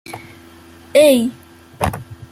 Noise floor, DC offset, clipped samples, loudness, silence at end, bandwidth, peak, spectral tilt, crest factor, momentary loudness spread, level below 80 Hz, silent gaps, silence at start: -42 dBFS; under 0.1%; under 0.1%; -16 LUFS; 0.05 s; 16 kHz; 0 dBFS; -5 dB/octave; 18 dB; 22 LU; -44 dBFS; none; 0.1 s